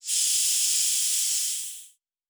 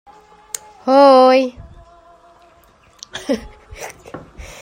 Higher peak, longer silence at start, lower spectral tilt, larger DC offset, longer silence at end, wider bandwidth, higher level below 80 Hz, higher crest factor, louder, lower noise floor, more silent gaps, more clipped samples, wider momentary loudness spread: second, -12 dBFS vs -2 dBFS; second, 0.05 s vs 0.85 s; second, 6.5 dB/octave vs -4 dB/octave; neither; first, 0.45 s vs 0.2 s; first, over 20 kHz vs 16 kHz; second, -74 dBFS vs -46 dBFS; about the same, 16 dB vs 16 dB; second, -22 LUFS vs -13 LUFS; about the same, -52 dBFS vs -50 dBFS; neither; neither; second, 12 LU vs 27 LU